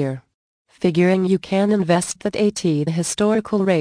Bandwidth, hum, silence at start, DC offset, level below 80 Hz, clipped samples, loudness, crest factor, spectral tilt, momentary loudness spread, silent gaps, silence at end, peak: 10.5 kHz; none; 0 s; under 0.1%; -56 dBFS; under 0.1%; -19 LUFS; 14 dB; -5.5 dB/octave; 6 LU; 0.34-0.65 s; 0 s; -4 dBFS